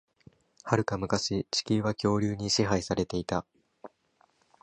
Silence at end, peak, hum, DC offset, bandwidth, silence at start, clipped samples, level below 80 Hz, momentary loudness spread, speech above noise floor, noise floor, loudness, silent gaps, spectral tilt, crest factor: 0.75 s; -8 dBFS; none; under 0.1%; 10.5 kHz; 0.65 s; under 0.1%; -54 dBFS; 5 LU; 40 dB; -68 dBFS; -29 LUFS; none; -5 dB/octave; 24 dB